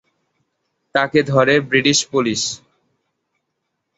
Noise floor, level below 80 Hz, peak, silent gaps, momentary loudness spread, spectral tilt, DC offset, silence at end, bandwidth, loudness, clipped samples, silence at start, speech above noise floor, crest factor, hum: -75 dBFS; -58 dBFS; -2 dBFS; none; 8 LU; -3.5 dB/octave; under 0.1%; 1.4 s; 8.2 kHz; -16 LUFS; under 0.1%; 0.95 s; 58 dB; 18 dB; none